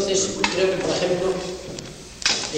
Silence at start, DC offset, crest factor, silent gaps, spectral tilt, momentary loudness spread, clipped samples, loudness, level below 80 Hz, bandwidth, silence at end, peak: 0 s; under 0.1%; 18 dB; none; -2.5 dB/octave; 14 LU; under 0.1%; -22 LUFS; -48 dBFS; 15.5 kHz; 0 s; -4 dBFS